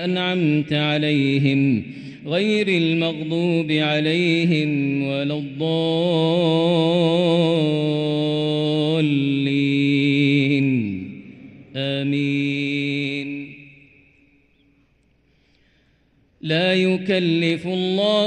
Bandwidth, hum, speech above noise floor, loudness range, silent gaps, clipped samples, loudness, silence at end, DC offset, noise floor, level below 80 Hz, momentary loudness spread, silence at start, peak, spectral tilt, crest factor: 9.4 kHz; none; 41 dB; 7 LU; none; under 0.1%; -20 LUFS; 0 s; under 0.1%; -61 dBFS; -64 dBFS; 7 LU; 0 s; -6 dBFS; -7 dB/octave; 14 dB